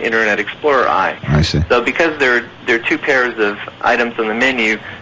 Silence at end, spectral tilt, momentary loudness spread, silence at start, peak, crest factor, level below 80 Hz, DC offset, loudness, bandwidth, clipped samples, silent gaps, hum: 0 s; -5.5 dB/octave; 4 LU; 0 s; -2 dBFS; 14 dB; -32 dBFS; under 0.1%; -15 LUFS; 8 kHz; under 0.1%; none; none